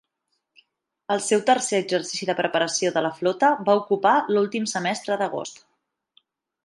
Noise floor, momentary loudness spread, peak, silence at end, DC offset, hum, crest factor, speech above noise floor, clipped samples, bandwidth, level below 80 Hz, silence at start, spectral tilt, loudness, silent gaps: -77 dBFS; 7 LU; -6 dBFS; 1.1 s; under 0.1%; none; 18 dB; 54 dB; under 0.1%; 11.5 kHz; -76 dBFS; 1.1 s; -3.5 dB/octave; -22 LUFS; none